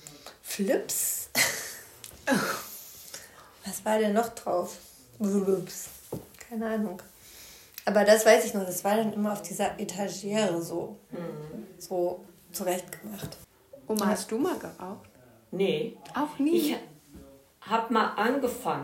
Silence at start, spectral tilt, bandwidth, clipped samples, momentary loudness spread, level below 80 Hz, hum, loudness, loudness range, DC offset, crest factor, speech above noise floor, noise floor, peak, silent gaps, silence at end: 0 s; -4 dB/octave; 16 kHz; under 0.1%; 18 LU; -66 dBFS; none; -28 LUFS; 7 LU; under 0.1%; 22 dB; 24 dB; -52 dBFS; -8 dBFS; none; 0 s